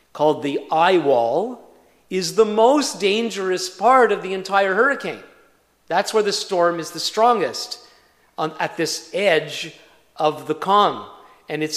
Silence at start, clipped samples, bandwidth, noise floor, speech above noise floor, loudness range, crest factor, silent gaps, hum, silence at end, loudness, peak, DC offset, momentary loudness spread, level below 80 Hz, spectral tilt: 0.15 s; under 0.1%; 15 kHz; -57 dBFS; 38 dB; 4 LU; 18 dB; none; none; 0 s; -19 LUFS; -2 dBFS; under 0.1%; 14 LU; -70 dBFS; -3.5 dB/octave